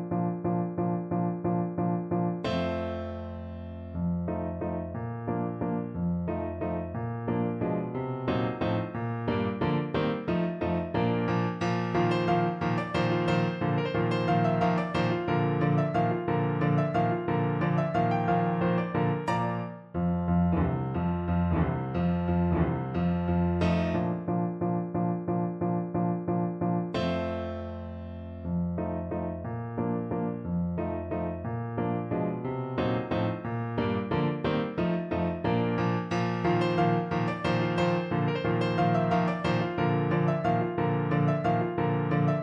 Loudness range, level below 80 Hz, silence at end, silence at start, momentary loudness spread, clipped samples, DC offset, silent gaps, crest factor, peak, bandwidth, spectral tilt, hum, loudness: 5 LU; -50 dBFS; 0 s; 0 s; 7 LU; under 0.1%; under 0.1%; none; 16 dB; -12 dBFS; 7.4 kHz; -8.5 dB/octave; none; -29 LUFS